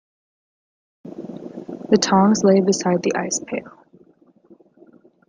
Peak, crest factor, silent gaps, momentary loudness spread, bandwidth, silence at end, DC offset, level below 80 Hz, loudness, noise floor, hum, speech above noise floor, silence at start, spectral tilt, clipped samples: -2 dBFS; 20 dB; none; 20 LU; 9.8 kHz; 1.6 s; under 0.1%; -64 dBFS; -18 LUFS; -54 dBFS; none; 37 dB; 1.05 s; -5 dB/octave; under 0.1%